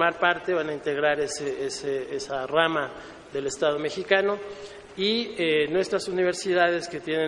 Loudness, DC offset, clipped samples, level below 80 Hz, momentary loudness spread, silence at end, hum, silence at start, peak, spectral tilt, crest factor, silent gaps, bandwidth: -26 LUFS; under 0.1%; under 0.1%; -62 dBFS; 10 LU; 0 s; none; 0 s; -4 dBFS; -3.5 dB/octave; 22 dB; none; 11.5 kHz